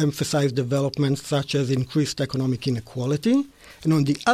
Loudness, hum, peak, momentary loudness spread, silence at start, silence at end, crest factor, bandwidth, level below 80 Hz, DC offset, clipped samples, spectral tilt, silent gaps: -23 LUFS; none; -6 dBFS; 5 LU; 0 s; 0 s; 16 dB; 15 kHz; -56 dBFS; under 0.1%; under 0.1%; -6 dB/octave; none